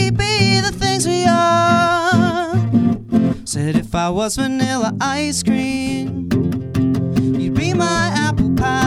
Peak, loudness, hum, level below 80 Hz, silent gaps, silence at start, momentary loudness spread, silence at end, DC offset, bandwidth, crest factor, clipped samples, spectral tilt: 0 dBFS; -17 LUFS; none; -36 dBFS; none; 0 s; 6 LU; 0 s; under 0.1%; 14.5 kHz; 16 dB; under 0.1%; -5 dB/octave